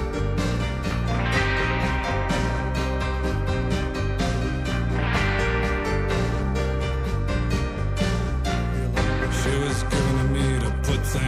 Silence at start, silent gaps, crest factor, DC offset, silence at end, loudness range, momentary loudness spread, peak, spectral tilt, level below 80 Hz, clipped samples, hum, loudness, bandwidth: 0 s; none; 14 dB; under 0.1%; 0 s; 1 LU; 4 LU; -8 dBFS; -5.5 dB/octave; -28 dBFS; under 0.1%; none; -24 LUFS; 14.5 kHz